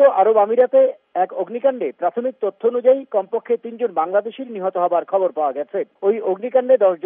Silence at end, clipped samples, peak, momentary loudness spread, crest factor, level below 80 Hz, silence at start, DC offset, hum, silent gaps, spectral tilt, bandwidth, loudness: 0.1 s; under 0.1%; -2 dBFS; 9 LU; 16 dB; -88 dBFS; 0 s; under 0.1%; none; none; -4.5 dB/octave; 3.7 kHz; -19 LUFS